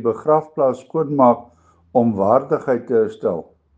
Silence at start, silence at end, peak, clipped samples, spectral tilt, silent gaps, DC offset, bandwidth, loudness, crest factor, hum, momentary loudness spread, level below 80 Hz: 0 s; 0.35 s; 0 dBFS; under 0.1%; -9.5 dB/octave; none; under 0.1%; 7.8 kHz; -18 LUFS; 18 dB; none; 8 LU; -66 dBFS